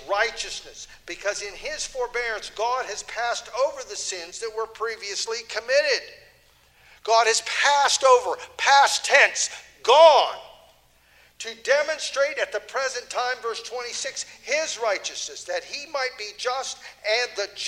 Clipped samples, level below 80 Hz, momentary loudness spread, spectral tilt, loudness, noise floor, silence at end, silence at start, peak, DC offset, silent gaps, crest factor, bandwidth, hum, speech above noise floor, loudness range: under 0.1%; -60 dBFS; 15 LU; 1.5 dB/octave; -23 LUFS; -58 dBFS; 0 s; 0 s; -2 dBFS; under 0.1%; none; 22 dB; 16 kHz; 60 Hz at -70 dBFS; 34 dB; 10 LU